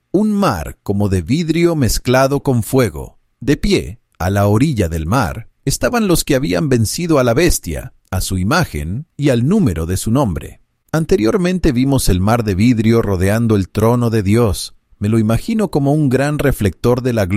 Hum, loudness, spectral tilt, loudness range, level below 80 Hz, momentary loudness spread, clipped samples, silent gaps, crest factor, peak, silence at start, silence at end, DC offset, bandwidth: none; -15 LUFS; -6 dB/octave; 2 LU; -30 dBFS; 9 LU; under 0.1%; none; 14 dB; -2 dBFS; 0.15 s; 0 s; under 0.1%; 16 kHz